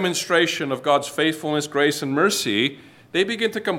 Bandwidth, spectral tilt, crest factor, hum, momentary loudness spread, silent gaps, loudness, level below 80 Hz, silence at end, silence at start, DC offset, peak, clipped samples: 17 kHz; -3.5 dB/octave; 18 dB; none; 5 LU; none; -21 LUFS; -72 dBFS; 0 s; 0 s; under 0.1%; -4 dBFS; under 0.1%